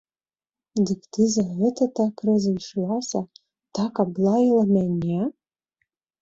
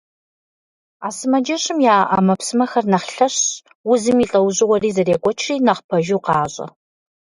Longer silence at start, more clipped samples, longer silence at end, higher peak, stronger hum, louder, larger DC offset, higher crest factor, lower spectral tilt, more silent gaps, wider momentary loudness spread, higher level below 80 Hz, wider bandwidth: second, 0.75 s vs 1 s; neither; first, 0.9 s vs 0.55 s; second, -8 dBFS vs -2 dBFS; neither; second, -23 LUFS vs -17 LUFS; neither; about the same, 16 dB vs 16 dB; first, -7 dB/octave vs -4.5 dB/octave; second, none vs 3.75-3.84 s, 5.84-5.89 s; about the same, 10 LU vs 10 LU; about the same, -60 dBFS vs -56 dBFS; second, 7.8 kHz vs 11.5 kHz